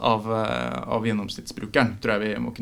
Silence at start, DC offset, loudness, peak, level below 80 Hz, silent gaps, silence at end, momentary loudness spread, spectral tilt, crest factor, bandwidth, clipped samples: 0 s; under 0.1%; -25 LUFS; -2 dBFS; -50 dBFS; none; 0 s; 6 LU; -6 dB/octave; 22 dB; 15 kHz; under 0.1%